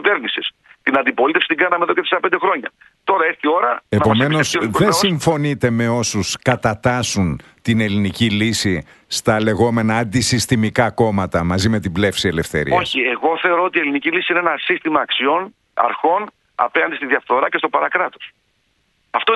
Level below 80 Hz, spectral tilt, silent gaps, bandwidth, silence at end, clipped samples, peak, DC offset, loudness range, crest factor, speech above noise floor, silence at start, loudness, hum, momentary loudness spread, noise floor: -46 dBFS; -4.5 dB/octave; none; 12.5 kHz; 0 s; under 0.1%; 0 dBFS; under 0.1%; 2 LU; 18 dB; 47 dB; 0 s; -17 LUFS; none; 6 LU; -64 dBFS